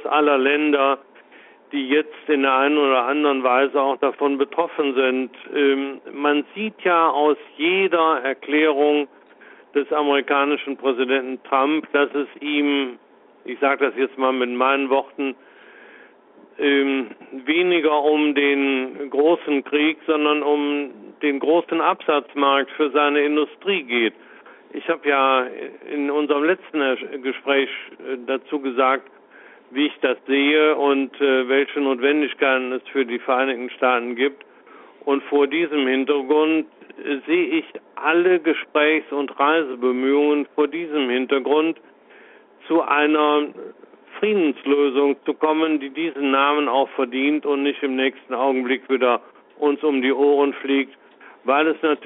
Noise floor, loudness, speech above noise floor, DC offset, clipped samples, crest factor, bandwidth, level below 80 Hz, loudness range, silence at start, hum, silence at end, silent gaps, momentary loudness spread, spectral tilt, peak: -50 dBFS; -20 LUFS; 30 dB; under 0.1%; under 0.1%; 16 dB; 4 kHz; -72 dBFS; 3 LU; 0 s; none; 0 s; none; 9 LU; -1 dB/octave; -4 dBFS